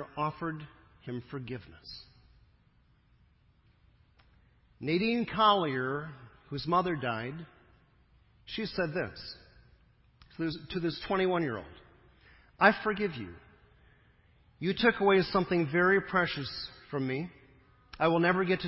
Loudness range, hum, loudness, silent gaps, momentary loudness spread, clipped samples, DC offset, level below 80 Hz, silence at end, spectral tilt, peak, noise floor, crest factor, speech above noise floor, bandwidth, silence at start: 12 LU; none; -30 LUFS; none; 20 LU; under 0.1%; under 0.1%; -60 dBFS; 0 s; -9.5 dB/octave; -8 dBFS; -66 dBFS; 26 dB; 36 dB; 5.8 kHz; 0 s